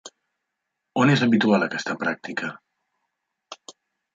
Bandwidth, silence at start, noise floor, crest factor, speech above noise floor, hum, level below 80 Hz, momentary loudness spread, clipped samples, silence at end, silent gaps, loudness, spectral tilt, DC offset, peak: 7.8 kHz; 0.05 s; -81 dBFS; 20 dB; 60 dB; none; -68 dBFS; 22 LU; under 0.1%; 0.45 s; none; -22 LUFS; -6 dB/octave; under 0.1%; -6 dBFS